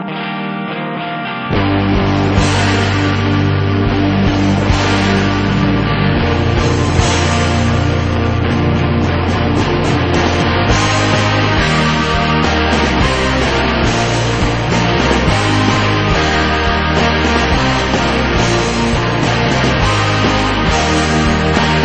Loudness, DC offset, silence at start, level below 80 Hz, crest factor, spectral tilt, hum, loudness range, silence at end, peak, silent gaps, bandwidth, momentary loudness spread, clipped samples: -13 LUFS; 1%; 0 s; -24 dBFS; 12 dB; -5.5 dB/octave; none; 1 LU; 0 s; 0 dBFS; none; 8.8 kHz; 2 LU; under 0.1%